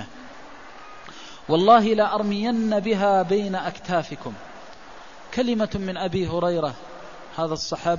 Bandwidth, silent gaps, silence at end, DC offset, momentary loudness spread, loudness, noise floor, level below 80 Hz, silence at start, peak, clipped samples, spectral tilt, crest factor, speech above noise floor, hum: 7.4 kHz; none; 0 s; 0.6%; 23 LU; -22 LUFS; -44 dBFS; -52 dBFS; 0 s; -2 dBFS; under 0.1%; -6 dB/octave; 20 dB; 22 dB; none